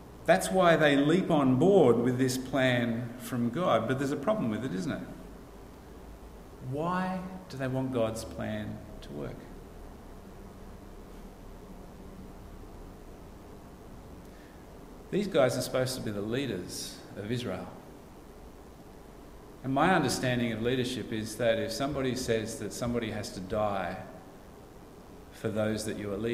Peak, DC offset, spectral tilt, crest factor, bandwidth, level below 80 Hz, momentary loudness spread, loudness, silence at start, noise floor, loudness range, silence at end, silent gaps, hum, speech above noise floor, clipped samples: -10 dBFS; under 0.1%; -5.5 dB/octave; 22 dB; 16 kHz; -52 dBFS; 24 LU; -30 LUFS; 0 s; -50 dBFS; 22 LU; 0 s; none; none; 21 dB; under 0.1%